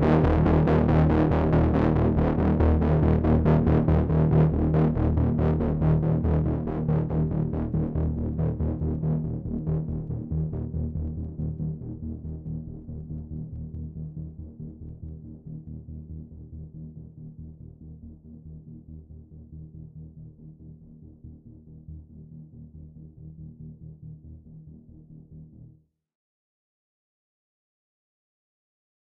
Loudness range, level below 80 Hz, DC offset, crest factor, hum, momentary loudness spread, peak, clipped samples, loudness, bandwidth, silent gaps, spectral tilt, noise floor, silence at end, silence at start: 24 LU; -34 dBFS; under 0.1%; 20 dB; none; 25 LU; -6 dBFS; under 0.1%; -25 LUFS; 4.5 kHz; none; -11 dB/octave; -56 dBFS; 3.35 s; 0 s